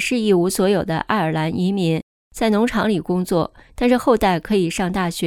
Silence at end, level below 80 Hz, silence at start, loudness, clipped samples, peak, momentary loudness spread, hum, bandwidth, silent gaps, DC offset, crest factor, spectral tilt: 0 s; -42 dBFS; 0 s; -19 LUFS; under 0.1%; -4 dBFS; 5 LU; none; 17.5 kHz; 2.03-2.31 s; under 0.1%; 16 dB; -5.5 dB/octave